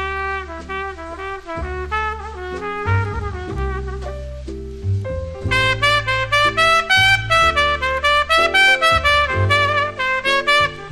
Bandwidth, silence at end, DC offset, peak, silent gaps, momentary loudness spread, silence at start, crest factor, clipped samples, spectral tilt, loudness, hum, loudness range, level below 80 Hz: 13.5 kHz; 0 s; under 0.1%; 0 dBFS; none; 16 LU; 0 s; 18 dB; under 0.1%; -3.5 dB/octave; -16 LUFS; none; 11 LU; -32 dBFS